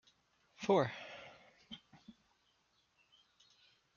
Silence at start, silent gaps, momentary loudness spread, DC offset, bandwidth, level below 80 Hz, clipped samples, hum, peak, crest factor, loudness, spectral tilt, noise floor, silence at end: 0.6 s; none; 21 LU; under 0.1%; 7.2 kHz; -80 dBFS; under 0.1%; none; -20 dBFS; 24 dB; -37 LUFS; -4.5 dB/octave; -77 dBFS; 1.85 s